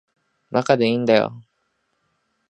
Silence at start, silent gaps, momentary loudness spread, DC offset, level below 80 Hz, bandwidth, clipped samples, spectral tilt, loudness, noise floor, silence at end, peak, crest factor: 0.5 s; none; 8 LU; under 0.1%; -68 dBFS; 9.8 kHz; under 0.1%; -6 dB/octave; -19 LUFS; -71 dBFS; 1.1 s; -2 dBFS; 20 dB